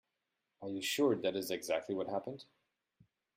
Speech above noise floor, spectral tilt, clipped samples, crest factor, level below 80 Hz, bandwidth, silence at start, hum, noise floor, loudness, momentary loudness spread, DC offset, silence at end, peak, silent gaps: 51 dB; -4 dB/octave; under 0.1%; 18 dB; -82 dBFS; 16 kHz; 0.6 s; none; -87 dBFS; -36 LUFS; 16 LU; under 0.1%; 0.95 s; -20 dBFS; none